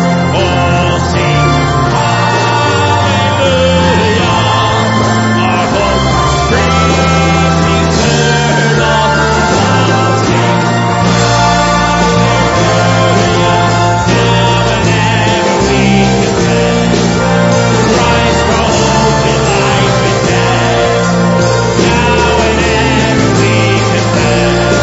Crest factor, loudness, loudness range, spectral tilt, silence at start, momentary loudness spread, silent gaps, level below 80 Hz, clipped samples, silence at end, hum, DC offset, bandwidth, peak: 10 dB; -9 LUFS; 1 LU; -5 dB/octave; 0 s; 2 LU; none; -24 dBFS; under 0.1%; 0 s; none; under 0.1%; 8 kHz; 0 dBFS